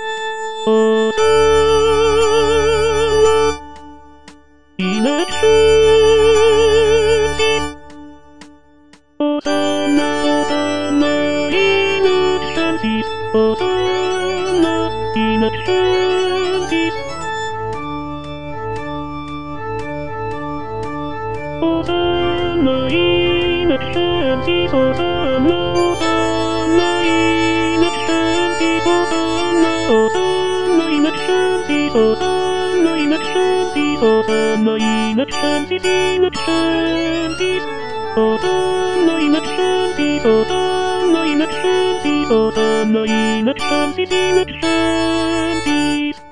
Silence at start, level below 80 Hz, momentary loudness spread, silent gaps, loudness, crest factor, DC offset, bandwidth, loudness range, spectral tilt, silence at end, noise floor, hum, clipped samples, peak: 0 s; -38 dBFS; 11 LU; none; -16 LUFS; 14 dB; 3%; 10.5 kHz; 6 LU; -4.5 dB/octave; 0 s; -48 dBFS; none; under 0.1%; -2 dBFS